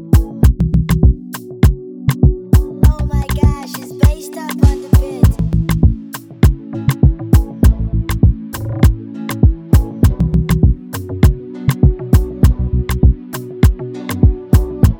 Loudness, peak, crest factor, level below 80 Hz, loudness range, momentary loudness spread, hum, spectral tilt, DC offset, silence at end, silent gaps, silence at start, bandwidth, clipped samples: -15 LUFS; 0 dBFS; 12 dB; -16 dBFS; 1 LU; 11 LU; none; -7.5 dB/octave; under 0.1%; 0 s; none; 0 s; 17.5 kHz; under 0.1%